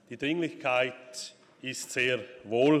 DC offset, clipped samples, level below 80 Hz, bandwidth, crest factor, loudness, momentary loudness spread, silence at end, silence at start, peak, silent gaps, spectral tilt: under 0.1%; under 0.1%; -72 dBFS; 15 kHz; 18 dB; -30 LUFS; 14 LU; 0 s; 0.1 s; -12 dBFS; none; -4.5 dB/octave